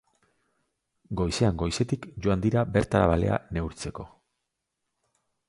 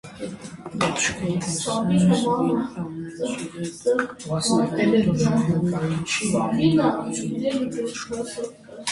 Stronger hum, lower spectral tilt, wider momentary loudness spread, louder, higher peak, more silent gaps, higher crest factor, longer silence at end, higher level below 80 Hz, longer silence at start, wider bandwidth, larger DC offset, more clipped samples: neither; first, -6.5 dB/octave vs -5 dB/octave; about the same, 14 LU vs 12 LU; second, -27 LUFS vs -23 LUFS; about the same, -6 dBFS vs -6 dBFS; neither; first, 22 dB vs 16 dB; first, 1.4 s vs 0 s; first, -42 dBFS vs -52 dBFS; first, 1.1 s vs 0.05 s; about the same, 11.5 kHz vs 11.5 kHz; neither; neither